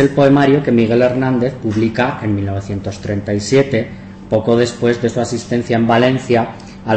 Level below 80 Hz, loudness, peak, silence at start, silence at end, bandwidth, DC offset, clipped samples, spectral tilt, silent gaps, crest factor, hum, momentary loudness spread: -44 dBFS; -15 LUFS; -2 dBFS; 0 s; 0 s; 8.6 kHz; under 0.1%; under 0.1%; -6.5 dB/octave; none; 12 dB; none; 10 LU